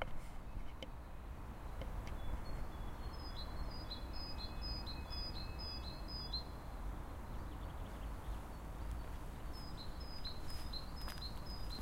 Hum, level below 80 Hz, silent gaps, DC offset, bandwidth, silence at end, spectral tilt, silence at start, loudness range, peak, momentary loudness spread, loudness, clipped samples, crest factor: none; -48 dBFS; none; under 0.1%; 16 kHz; 0 s; -5 dB/octave; 0 s; 3 LU; -24 dBFS; 6 LU; -48 LUFS; under 0.1%; 20 dB